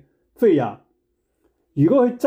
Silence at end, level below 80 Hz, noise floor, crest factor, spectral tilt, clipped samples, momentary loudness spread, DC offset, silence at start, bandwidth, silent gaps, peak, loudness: 0 s; -64 dBFS; -70 dBFS; 14 dB; -9 dB/octave; under 0.1%; 12 LU; under 0.1%; 0.4 s; 16 kHz; none; -6 dBFS; -19 LUFS